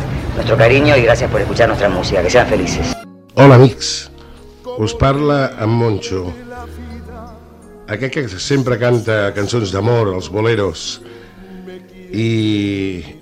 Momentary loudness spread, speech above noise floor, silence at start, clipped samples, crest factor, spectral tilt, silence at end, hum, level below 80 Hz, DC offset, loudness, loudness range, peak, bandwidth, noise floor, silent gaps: 21 LU; 25 dB; 0 s; 0.1%; 14 dB; -6 dB/octave; 0.05 s; none; -34 dBFS; under 0.1%; -14 LUFS; 8 LU; 0 dBFS; 13 kHz; -38 dBFS; none